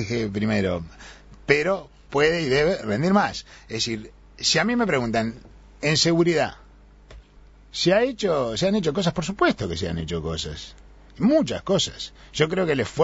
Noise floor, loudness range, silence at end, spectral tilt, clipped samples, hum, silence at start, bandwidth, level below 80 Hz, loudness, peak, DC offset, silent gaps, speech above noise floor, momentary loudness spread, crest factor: -50 dBFS; 2 LU; 0 s; -4.5 dB/octave; under 0.1%; none; 0 s; 8 kHz; -46 dBFS; -23 LUFS; -2 dBFS; under 0.1%; none; 27 dB; 12 LU; 22 dB